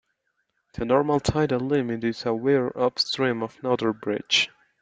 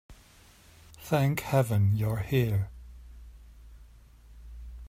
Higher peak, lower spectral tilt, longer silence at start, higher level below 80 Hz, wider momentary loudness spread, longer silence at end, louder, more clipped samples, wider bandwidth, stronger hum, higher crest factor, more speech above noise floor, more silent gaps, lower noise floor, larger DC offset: first, -6 dBFS vs -12 dBFS; second, -5 dB/octave vs -7 dB/octave; first, 0.75 s vs 0.1 s; about the same, -52 dBFS vs -48 dBFS; second, 7 LU vs 24 LU; first, 0.35 s vs 0 s; first, -24 LUFS vs -28 LUFS; neither; second, 9.2 kHz vs 16 kHz; neither; about the same, 18 dB vs 18 dB; first, 51 dB vs 30 dB; neither; first, -74 dBFS vs -56 dBFS; neither